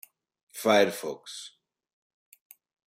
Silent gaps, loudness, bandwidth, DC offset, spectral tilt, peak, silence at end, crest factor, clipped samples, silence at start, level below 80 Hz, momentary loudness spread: none; -26 LUFS; 16 kHz; under 0.1%; -3.5 dB/octave; -8 dBFS; 1.5 s; 22 dB; under 0.1%; 0.55 s; -80 dBFS; 22 LU